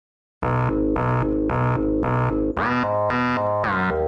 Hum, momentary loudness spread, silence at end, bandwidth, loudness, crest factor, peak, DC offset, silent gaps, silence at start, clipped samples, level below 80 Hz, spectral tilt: none; 1 LU; 0 s; 6.6 kHz; -22 LUFS; 10 dB; -12 dBFS; under 0.1%; none; 0.4 s; under 0.1%; -36 dBFS; -9 dB/octave